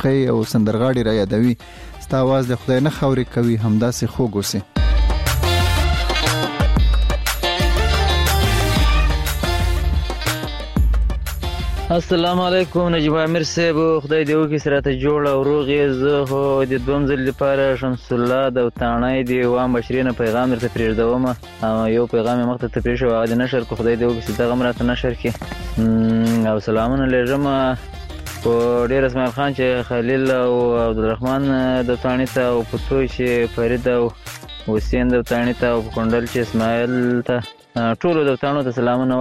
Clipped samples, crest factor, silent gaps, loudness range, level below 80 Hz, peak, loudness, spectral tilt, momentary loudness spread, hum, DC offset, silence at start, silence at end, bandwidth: under 0.1%; 14 dB; none; 2 LU; -26 dBFS; -4 dBFS; -19 LUFS; -6 dB/octave; 5 LU; none; 0.2%; 0 s; 0 s; 16 kHz